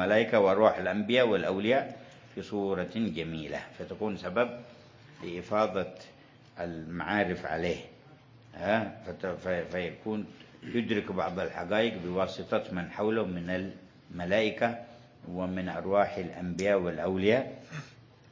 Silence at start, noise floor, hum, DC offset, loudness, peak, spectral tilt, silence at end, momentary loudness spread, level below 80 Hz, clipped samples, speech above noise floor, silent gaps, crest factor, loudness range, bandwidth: 0 s; -55 dBFS; none; under 0.1%; -31 LUFS; -8 dBFS; -6.5 dB/octave; 0.4 s; 18 LU; -58 dBFS; under 0.1%; 25 dB; none; 22 dB; 4 LU; 7.6 kHz